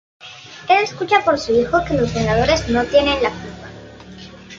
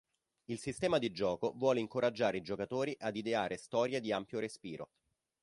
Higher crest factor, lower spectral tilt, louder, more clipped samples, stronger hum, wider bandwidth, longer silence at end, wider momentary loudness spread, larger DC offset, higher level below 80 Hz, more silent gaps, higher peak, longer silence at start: about the same, 16 dB vs 18 dB; about the same, -5 dB/octave vs -5 dB/octave; first, -17 LUFS vs -36 LUFS; neither; neither; second, 7.8 kHz vs 11.5 kHz; second, 0 s vs 0.6 s; first, 22 LU vs 11 LU; neither; first, -38 dBFS vs -70 dBFS; neither; first, -2 dBFS vs -18 dBFS; second, 0.2 s vs 0.5 s